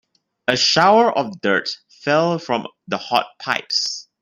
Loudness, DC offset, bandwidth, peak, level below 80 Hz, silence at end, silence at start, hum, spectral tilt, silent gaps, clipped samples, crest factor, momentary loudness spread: -19 LUFS; under 0.1%; 16 kHz; 0 dBFS; -64 dBFS; 0.2 s; 0.5 s; none; -3.5 dB/octave; none; under 0.1%; 20 dB; 13 LU